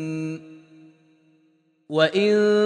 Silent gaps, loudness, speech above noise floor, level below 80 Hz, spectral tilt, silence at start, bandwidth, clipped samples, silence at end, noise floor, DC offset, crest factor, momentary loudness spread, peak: none; -22 LUFS; 43 dB; -78 dBFS; -6 dB/octave; 0 s; 9.6 kHz; under 0.1%; 0 s; -63 dBFS; under 0.1%; 18 dB; 14 LU; -6 dBFS